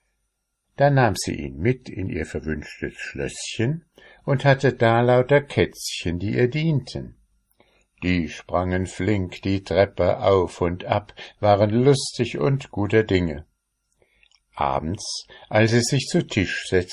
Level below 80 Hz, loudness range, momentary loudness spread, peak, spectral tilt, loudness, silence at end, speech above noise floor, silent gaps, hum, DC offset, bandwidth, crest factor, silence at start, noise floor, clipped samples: -42 dBFS; 5 LU; 12 LU; -4 dBFS; -6 dB/octave; -22 LUFS; 0 s; 54 dB; none; none; under 0.1%; 13 kHz; 20 dB; 0.8 s; -76 dBFS; under 0.1%